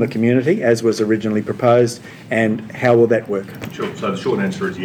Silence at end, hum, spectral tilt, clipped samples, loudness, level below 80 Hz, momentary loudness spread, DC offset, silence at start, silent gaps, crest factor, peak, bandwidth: 0 s; none; -6.5 dB/octave; under 0.1%; -17 LUFS; -60 dBFS; 11 LU; under 0.1%; 0 s; none; 16 dB; -2 dBFS; 18 kHz